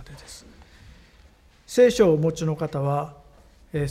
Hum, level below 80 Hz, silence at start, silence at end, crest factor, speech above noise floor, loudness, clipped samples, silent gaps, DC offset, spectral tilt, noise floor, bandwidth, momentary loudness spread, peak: none; -50 dBFS; 0 s; 0 s; 18 dB; 32 dB; -22 LUFS; under 0.1%; none; under 0.1%; -6.5 dB/octave; -54 dBFS; 14.5 kHz; 25 LU; -6 dBFS